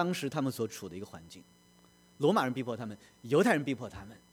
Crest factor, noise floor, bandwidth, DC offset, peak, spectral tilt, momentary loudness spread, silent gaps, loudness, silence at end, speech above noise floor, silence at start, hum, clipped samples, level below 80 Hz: 20 dB; -62 dBFS; over 20 kHz; under 0.1%; -14 dBFS; -5.5 dB/octave; 21 LU; none; -32 LUFS; 0.15 s; 30 dB; 0 s; none; under 0.1%; -68 dBFS